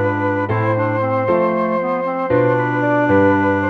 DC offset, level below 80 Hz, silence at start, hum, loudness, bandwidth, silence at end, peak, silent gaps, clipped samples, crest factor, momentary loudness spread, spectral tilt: under 0.1%; -54 dBFS; 0 s; none; -17 LUFS; 6.2 kHz; 0 s; -4 dBFS; none; under 0.1%; 12 dB; 5 LU; -9.5 dB/octave